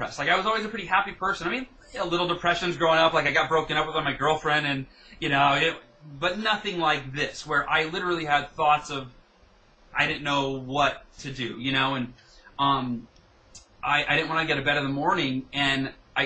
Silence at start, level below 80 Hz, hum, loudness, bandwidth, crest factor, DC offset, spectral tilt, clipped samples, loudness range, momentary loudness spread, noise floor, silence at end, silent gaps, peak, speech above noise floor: 0 s; -52 dBFS; none; -25 LUFS; 9 kHz; 18 dB; under 0.1%; -4.5 dB/octave; under 0.1%; 4 LU; 11 LU; -58 dBFS; 0 s; none; -8 dBFS; 32 dB